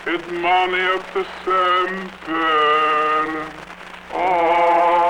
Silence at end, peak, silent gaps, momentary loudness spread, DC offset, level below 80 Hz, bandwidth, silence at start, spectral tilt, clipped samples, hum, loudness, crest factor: 0 s; -6 dBFS; none; 13 LU; under 0.1%; -52 dBFS; 12 kHz; 0 s; -4.5 dB/octave; under 0.1%; none; -18 LUFS; 14 dB